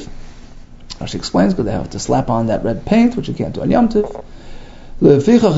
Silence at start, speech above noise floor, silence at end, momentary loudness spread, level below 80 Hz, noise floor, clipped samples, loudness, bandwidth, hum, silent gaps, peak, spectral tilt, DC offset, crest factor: 0 s; 21 dB; 0 s; 14 LU; -32 dBFS; -35 dBFS; under 0.1%; -16 LUFS; 8 kHz; none; none; 0 dBFS; -7 dB/octave; under 0.1%; 16 dB